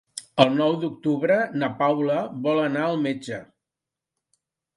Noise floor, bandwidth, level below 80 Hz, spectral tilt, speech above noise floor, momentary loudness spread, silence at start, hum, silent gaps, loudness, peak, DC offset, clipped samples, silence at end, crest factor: -87 dBFS; 11.5 kHz; -68 dBFS; -6 dB/octave; 65 dB; 10 LU; 0.15 s; none; none; -23 LUFS; 0 dBFS; under 0.1%; under 0.1%; 1.3 s; 24 dB